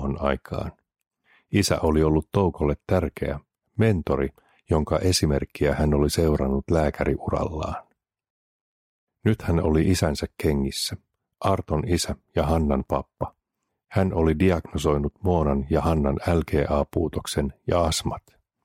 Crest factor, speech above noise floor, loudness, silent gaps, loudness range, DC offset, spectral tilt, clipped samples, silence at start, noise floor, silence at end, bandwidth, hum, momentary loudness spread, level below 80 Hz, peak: 18 dB; 57 dB; -24 LUFS; 8.30-9.07 s; 3 LU; under 0.1%; -6 dB/octave; under 0.1%; 0 s; -80 dBFS; 0.45 s; 16 kHz; none; 10 LU; -36 dBFS; -6 dBFS